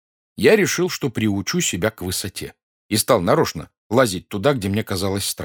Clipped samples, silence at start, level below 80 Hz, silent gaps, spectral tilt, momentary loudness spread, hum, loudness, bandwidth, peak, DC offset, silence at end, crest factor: under 0.1%; 0.4 s; -52 dBFS; 2.63-2.89 s, 3.78-3.90 s; -4 dB/octave; 9 LU; none; -20 LUFS; 19.5 kHz; -2 dBFS; under 0.1%; 0 s; 20 dB